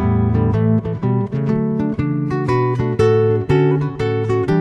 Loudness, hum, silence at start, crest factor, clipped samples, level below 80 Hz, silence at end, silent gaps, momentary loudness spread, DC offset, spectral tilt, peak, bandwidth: -17 LUFS; none; 0 s; 14 dB; under 0.1%; -36 dBFS; 0 s; none; 5 LU; under 0.1%; -9 dB/octave; -2 dBFS; 8.4 kHz